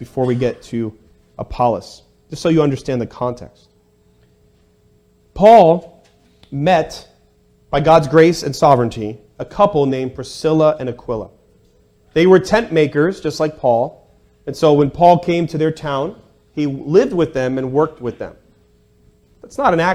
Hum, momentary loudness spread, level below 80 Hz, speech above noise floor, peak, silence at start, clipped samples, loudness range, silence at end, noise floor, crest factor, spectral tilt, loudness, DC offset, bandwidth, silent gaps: none; 17 LU; -44 dBFS; 40 dB; 0 dBFS; 0 s; 0.2%; 6 LU; 0 s; -55 dBFS; 16 dB; -6.5 dB/octave; -16 LUFS; under 0.1%; 13.5 kHz; none